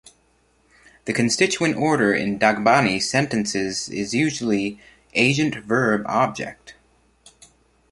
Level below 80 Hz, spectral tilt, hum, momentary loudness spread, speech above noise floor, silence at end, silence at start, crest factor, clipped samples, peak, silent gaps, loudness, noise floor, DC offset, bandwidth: -56 dBFS; -4 dB/octave; none; 8 LU; 41 dB; 1.2 s; 1.05 s; 20 dB; under 0.1%; -2 dBFS; none; -20 LUFS; -62 dBFS; under 0.1%; 11.5 kHz